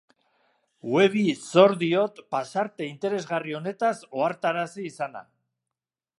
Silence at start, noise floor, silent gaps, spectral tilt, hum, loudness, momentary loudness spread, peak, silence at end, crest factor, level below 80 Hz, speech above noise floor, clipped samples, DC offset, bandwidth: 0.85 s; under -90 dBFS; none; -5.5 dB/octave; none; -25 LUFS; 14 LU; -2 dBFS; 0.95 s; 24 dB; -78 dBFS; over 65 dB; under 0.1%; under 0.1%; 11.5 kHz